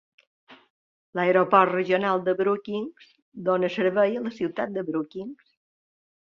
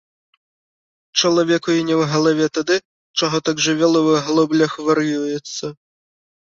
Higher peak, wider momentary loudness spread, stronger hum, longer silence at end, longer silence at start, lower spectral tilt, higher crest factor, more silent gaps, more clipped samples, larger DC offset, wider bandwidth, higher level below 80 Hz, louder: about the same, -4 dBFS vs -2 dBFS; first, 15 LU vs 9 LU; neither; first, 1.05 s vs 0.85 s; second, 0.5 s vs 1.15 s; first, -7.5 dB/octave vs -4 dB/octave; first, 22 dB vs 16 dB; first, 0.70-1.13 s, 3.22-3.32 s vs 2.85-3.14 s; neither; neither; about the same, 7 kHz vs 7.6 kHz; second, -72 dBFS vs -62 dBFS; second, -24 LUFS vs -18 LUFS